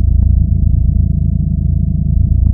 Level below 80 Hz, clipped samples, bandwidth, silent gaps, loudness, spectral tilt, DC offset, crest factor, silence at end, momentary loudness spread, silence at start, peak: -14 dBFS; under 0.1%; 0.7 kHz; none; -14 LUFS; -15.5 dB/octave; under 0.1%; 10 dB; 0 s; 3 LU; 0 s; 0 dBFS